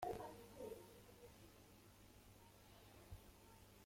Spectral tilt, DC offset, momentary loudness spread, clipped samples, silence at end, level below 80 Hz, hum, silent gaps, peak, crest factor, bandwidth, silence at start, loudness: -5 dB/octave; under 0.1%; 11 LU; under 0.1%; 0 s; -70 dBFS; 50 Hz at -70 dBFS; none; -32 dBFS; 24 dB; 16.5 kHz; 0 s; -60 LUFS